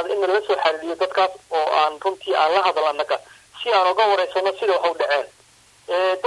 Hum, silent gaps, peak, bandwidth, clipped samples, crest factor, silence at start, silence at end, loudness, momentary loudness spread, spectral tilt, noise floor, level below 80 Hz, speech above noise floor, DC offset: none; none; -4 dBFS; 12 kHz; under 0.1%; 16 dB; 0 s; 0 s; -20 LUFS; 7 LU; -2 dB/octave; -53 dBFS; -68 dBFS; 33 dB; under 0.1%